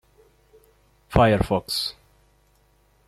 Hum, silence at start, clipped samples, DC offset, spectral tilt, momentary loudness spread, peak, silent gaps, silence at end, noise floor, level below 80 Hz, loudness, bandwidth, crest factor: 50 Hz at -45 dBFS; 1.1 s; under 0.1%; under 0.1%; -5.5 dB/octave; 8 LU; -2 dBFS; none; 1.15 s; -61 dBFS; -40 dBFS; -22 LUFS; 15 kHz; 24 dB